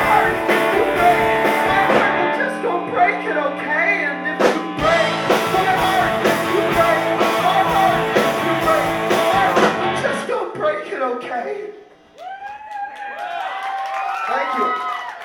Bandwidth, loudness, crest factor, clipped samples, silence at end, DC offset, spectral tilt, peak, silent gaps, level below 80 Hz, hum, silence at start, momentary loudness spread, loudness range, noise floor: 19 kHz; -18 LUFS; 16 dB; under 0.1%; 0 s; under 0.1%; -4.5 dB/octave; -2 dBFS; none; -48 dBFS; none; 0 s; 11 LU; 9 LU; -43 dBFS